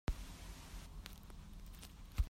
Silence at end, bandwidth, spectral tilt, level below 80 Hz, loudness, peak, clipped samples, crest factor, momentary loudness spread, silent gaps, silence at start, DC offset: 0 s; 16 kHz; -5 dB/octave; -46 dBFS; -53 LUFS; -24 dBFS; under 0.1%; 22 dB; 7 LU; none; 0.1 s; under 0.1%